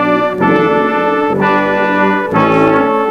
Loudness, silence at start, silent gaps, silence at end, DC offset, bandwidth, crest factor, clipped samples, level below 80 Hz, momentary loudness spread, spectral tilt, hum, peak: -12 LUFS; 0 s; none; 0 s; under 0.1%; 14.5 kHz; 12 dB; under 0.1%; -48 dBFS; 3 LU; -7.5 dB/octave; none; 0 dBFS